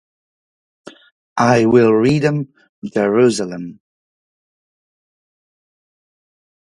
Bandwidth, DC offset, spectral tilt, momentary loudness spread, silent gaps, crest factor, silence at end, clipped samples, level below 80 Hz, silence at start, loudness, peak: 11.5 kHz; under 0.1%; -6.5 dB/octave; 19 LU; 1.12-1.36 s, 2.69-2.82 s; 18 dB; 3.05 s; under 0.1%; -56 dBFS; 0.85 s; -15 LUFS; 0 dBFS